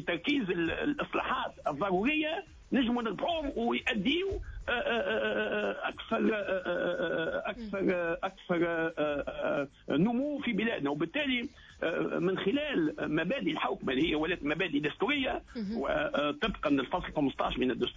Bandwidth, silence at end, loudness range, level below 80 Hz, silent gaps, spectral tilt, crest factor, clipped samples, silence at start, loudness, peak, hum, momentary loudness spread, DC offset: 7.6 kHz; 0 s; 1 LU; -54 dBFS; none; -6.5 dB/octave; 14 dB; under 0.1%; 0 s; -32 LUFS; -18 dBFS; none; 5 LU; under 0.1%